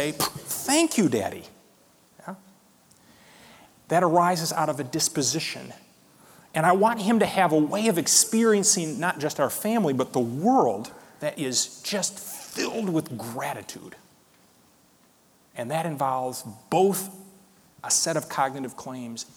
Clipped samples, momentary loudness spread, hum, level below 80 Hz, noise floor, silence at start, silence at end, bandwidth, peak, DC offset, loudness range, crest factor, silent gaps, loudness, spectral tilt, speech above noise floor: under 0.1%; 17 LU; none; -68 dBFS; -60 dBFS; 0 s; 0.15 s; over 20 kHz; -6 dBFS; under 0.1%; 11 LU; 20 dB; none; -24 LUFS; -3.5 dB/octave; 36 dB